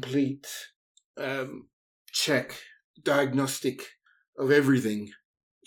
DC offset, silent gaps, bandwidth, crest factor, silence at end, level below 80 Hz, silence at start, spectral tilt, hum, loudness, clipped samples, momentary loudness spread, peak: under 0.1%; 0.76-0.95 s, 1.04-1.14 s, 1.73-2.05 s, 2.84-2.94 s, 4.28-4.33 s; over 20 kHz; 20 dB; 0.5 s; -76 dBFS; 0 s; -4.5 dB/octave; none; -27 LUFS; under 0.1%; 21 LU; -8 dBFS